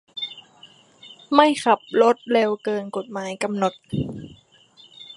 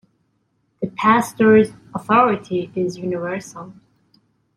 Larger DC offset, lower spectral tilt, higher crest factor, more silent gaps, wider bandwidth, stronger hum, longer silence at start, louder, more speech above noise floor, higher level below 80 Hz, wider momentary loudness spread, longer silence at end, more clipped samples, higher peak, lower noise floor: neither; about the same, -5 dB/octave vs -6 dB/octave; about the same, 22 dB vs 18 dB; neither; second, 11.5 kHz vs 15 kHz; neither; second, 0.15 s vs 0.8 s; second, -22 LUFS vs -18 LUFS; second, 32 dB vs 49 dB; about the same, -56 dBFS vs -60 dBFS; about the same, 15 LU vs 16 LU; second, 0.05 s vs 0.85 s; neither; about the same, 0 dBFS vs -2 dBFS; second, -53 dBFS vs -67 dBFS